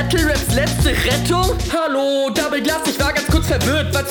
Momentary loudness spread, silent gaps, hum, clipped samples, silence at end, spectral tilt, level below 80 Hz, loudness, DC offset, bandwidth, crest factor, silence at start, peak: 2 LU; none; none; under 0.1%; 0 s; -4.5 dB/octave; -26 dBFS; -17 LUFS; under 0.1%; 19 kHz; 14 dB; 0 s; -2 dBFS